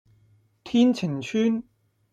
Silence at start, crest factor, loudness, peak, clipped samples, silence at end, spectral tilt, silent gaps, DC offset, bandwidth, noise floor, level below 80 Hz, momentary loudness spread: 0.65 s; 16 dB; -24 LUFS; -10 dBFS; under 0.1%; 0.5 s; -6.5 dB/octave; none; under 0.1%; 8 kHz; -61 dBFS; -68 dBFS; 7 LU